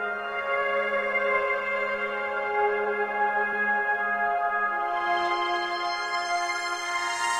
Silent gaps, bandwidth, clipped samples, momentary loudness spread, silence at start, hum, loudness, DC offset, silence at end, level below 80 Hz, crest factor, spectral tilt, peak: none; 15.5 kHz; under 0.1%; 4 LU; 0 s; none; -26 LUFS; under 0.1%; 0 s; -64 dBFS; 16 dB; -1.5 dB/octave; -12 dBFS